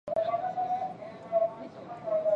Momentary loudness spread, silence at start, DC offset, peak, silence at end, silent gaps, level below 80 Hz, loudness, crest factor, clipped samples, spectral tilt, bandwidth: 13 LU; 0.05 s; under 0.1%; -16 dBFS; 0 s; none; -72 dBFS; -32 LUFS; 14 dB; under 0.1%; -7 dB/octave; 6.4 kHz